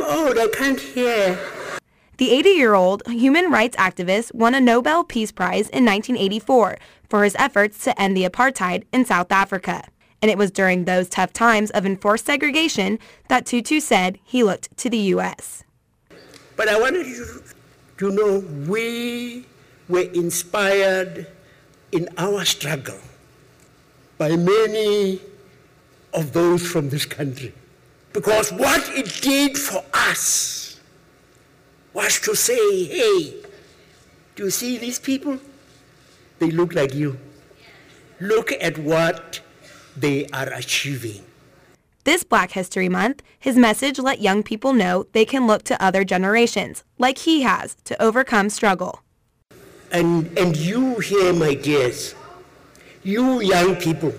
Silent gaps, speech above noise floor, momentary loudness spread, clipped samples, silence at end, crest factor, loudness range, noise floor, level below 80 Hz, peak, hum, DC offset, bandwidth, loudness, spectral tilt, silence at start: none; 39 dB; 12 LU; under 0.1%; 0 s; 18 dB; 6 LU; -58 dBFS; -54 dBFS; -4 dBFS; none; under 0.1%; 16 kHz; -19 LUFS; -4 dB/octave; 0 s